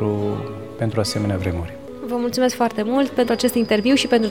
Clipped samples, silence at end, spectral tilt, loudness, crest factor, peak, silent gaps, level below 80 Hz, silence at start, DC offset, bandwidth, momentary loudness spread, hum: under 0.1%; 0 s; -5.5 dB/octave; -20 LUFS; 14 dB; -6 dBFS; none; -46 dBFS; 0 s; 0.4%; 17.5 kHz; 12 LU; none